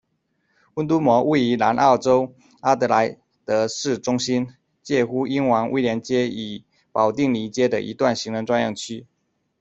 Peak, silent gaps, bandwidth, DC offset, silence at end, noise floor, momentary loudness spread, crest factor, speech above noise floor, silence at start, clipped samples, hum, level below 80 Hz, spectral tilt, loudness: -2 dBFS; none; 8.2 kHz; under 0.1%; 0.55 s; -70 dBFS; 14 LU; 18 dB; 50 dB; 0.75 s; under 0.1%; none; -60 dBFS; -5 dB/octave; -21 LUFS